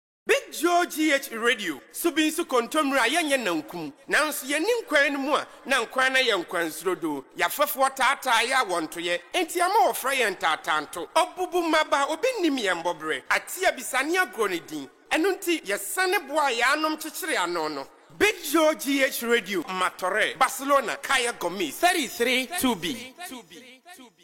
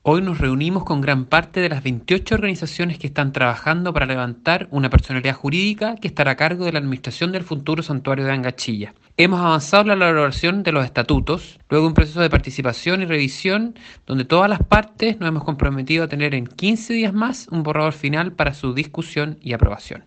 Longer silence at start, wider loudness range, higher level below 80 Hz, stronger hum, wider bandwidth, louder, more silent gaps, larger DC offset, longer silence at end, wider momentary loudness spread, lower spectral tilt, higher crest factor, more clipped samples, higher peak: first, 0.25 s vs 0.05 s; about the same, 2 LU vs 3 LU; second, -64 dBFS vs -30 dBFS; neither; first, 17 kHz vs 8.8 kHz; second, -24 LUFS vs -19 LUFS; neither; neither; about the same, 0.15 s vs 0.05 s; about the same, 7 LU vs 8 LU; second, -2 dB/octave vs -6 dB/octave; about the same, 16 dB vs 20 dB; neither; second, -10 dBFS vs 0 dBFS